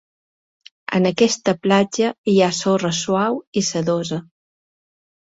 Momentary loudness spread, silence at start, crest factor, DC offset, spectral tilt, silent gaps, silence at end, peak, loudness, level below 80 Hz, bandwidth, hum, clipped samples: 7 LU; 0.9 s; 18 dB; under 0.1%; -4.5 dB/octave; 2.18-2.24 s, 3.47-3.52 s; 1 s; -2 dBFS; -19 LUFS; -60 dBFS; 8 kHz; none; under 0.1%